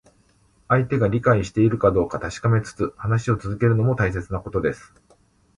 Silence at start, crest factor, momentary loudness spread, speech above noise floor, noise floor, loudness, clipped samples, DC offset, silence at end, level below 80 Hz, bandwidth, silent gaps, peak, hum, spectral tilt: 0.7 s; 18 dB; 8 LU; 39 dB; -59 dBFS; -22 LUFS; under 0.1%; under 0.1%; 0.8 s; -42 dBFS; 10.5 kHz; none; -4 dBFS; none; -8 dB/octave